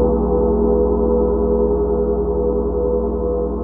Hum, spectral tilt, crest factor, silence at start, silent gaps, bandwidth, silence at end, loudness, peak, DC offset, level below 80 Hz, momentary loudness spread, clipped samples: 60 Hz at -25 dBFS; -14.5 dB/octave; 12 dB; 0 s; none; 1.8 kHz; 0 s; -18 LUFS; -4 dBFS; under 0.1%; -24 dBFS; 4 LU; under 0.1%